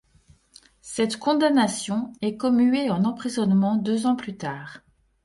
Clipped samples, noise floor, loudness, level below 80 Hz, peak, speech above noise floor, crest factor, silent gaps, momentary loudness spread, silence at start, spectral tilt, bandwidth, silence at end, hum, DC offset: under 0.1%; -58 dBFS; -23 LUFS; -62 dBFS; -8 dBFS; 35 dB; 16 dB; none; 13 LU; 0.85 s; -5.5 dB/octave; 11.5 kHz; 0.45 s; none; under 0.1%